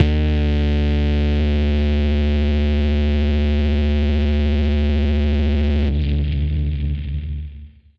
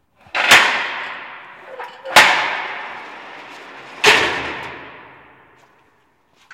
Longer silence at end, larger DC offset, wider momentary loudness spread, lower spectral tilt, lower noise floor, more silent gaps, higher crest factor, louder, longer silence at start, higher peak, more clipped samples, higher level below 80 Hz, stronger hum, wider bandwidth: first, 0.3 s vs 0 s; neither; second, 5 LU vs 25 LU; first, -8.5 dB/octave vs -0.5 dB/octave; second, -38 dBFS vs -59 dBFS; neither; about the same, 16 dB vs 20 dB; second, -19 LUFS vs -14 LUFS; second, 0 s vs 0.35 s; about the same, 0 dBFS vs 0 dBFS; neither; first, -20 dBFS vs -58 dBFS; neither; second, 5.6 kHz vs 16.5 kHz